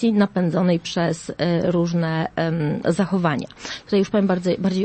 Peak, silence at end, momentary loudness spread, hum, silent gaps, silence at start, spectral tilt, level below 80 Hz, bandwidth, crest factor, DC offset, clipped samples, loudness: -4 dBFS; 0 s; 5 LU; none; none; 0 s; -7 dB/octave; -54 dBFS; 8.8 kHz; 16 dB; under 0.1%; under 0.1%; -21 LUFS